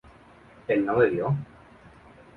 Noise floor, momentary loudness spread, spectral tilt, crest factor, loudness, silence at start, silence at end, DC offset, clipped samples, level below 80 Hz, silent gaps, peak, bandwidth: -52 dBFS; 18 LU; -9.5 dB/octave; 20 dB; -25 LUFS; 0.7 s; 0.95 s; under 0.1%; under 0.1%; -58 dBFS; none; -8 dBFS; 4.7 kHz